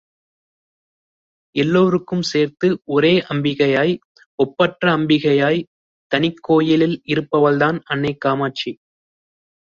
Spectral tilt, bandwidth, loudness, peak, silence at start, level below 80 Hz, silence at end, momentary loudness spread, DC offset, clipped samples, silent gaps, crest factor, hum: -6.5 dB/octave; 7.6 kHz; -18 LUFS; -2 dBFS; 1.55 s; -58 dBFS; 0.9 s; 8 LU; under 0.1%; under 0.1%; 4.05-4.15 s, 4.26-4.38 s, 5.67-6.10 s; 18 dB; none